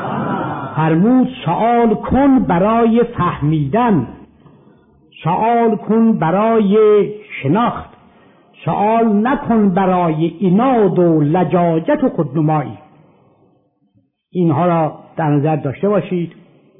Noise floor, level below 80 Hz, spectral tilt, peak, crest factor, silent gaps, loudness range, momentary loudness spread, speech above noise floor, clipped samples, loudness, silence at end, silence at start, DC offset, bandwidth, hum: -59 dBFS; -44 dBFS; -12.5 dB/octave; -4 dBFS; 12 dB; none; 5 LU; 9 LU; 45 dB; under 0.1%; -15 LUFS; 0.5 s; 0 s; under 0.1%; 3.8 kHz; none